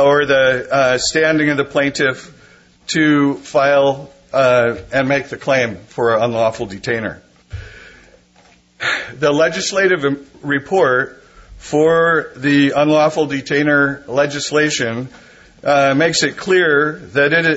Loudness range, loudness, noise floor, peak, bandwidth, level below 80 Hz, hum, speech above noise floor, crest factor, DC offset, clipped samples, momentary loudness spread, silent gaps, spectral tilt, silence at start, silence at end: 5 LU; -15 LUFS; -50 dBFS; -2 dBFS; 8 kHz; -50 dBFS; none; 35 dB; 14 dB; under 0.1%; under 0.1%; 9 LU; none; -4.5 dB/octave; 0 s; 0 s